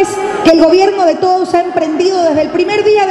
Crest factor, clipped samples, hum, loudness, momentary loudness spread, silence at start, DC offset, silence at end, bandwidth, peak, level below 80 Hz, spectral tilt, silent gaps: 10 dB; 0.2%; none; -10 LUFS; 5 LU; 0 s; under 0.1%; 0 s; 12 kHz; 0 dBFS; -46 dBFS; -4.5 dB/octave; none